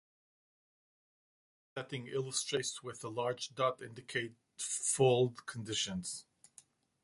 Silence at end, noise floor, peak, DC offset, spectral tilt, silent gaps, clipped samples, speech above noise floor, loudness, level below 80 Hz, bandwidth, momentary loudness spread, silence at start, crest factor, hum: 0.8 s; -65 dBFS; -18 dBFS; under 0.1%; -3.5 dB/octave; none; under 0.1%; 28 dB; -36 LUFS; -72 dBFS; 11.5 kHz; 16 LU; 1.75 s; 22 dB; none